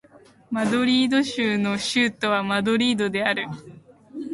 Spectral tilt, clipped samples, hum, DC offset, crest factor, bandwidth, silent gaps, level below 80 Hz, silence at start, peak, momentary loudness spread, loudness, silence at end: -4.5 dB/octave; under 0.1%; none; under 0.1%; 16 dB; 11.5 kHz; none; -62 dBFS; 0.5 s; -6 dBFS; 13 LU; -22 LUFS; 0 s